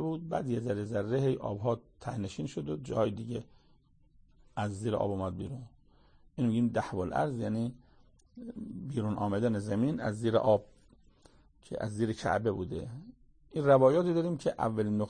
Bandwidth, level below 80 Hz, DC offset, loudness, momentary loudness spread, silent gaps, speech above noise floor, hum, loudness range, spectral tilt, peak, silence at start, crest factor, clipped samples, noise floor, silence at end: 9.8 kHz; -60 dBFS; under 0.1%; -32 LUFS; 14 LU; none; 33 dB; none; 7 LU; -7.5 dB/octave; -12 dBFS; 0 s; 20 dB; under 0.1%; -64 dBFS; 0 s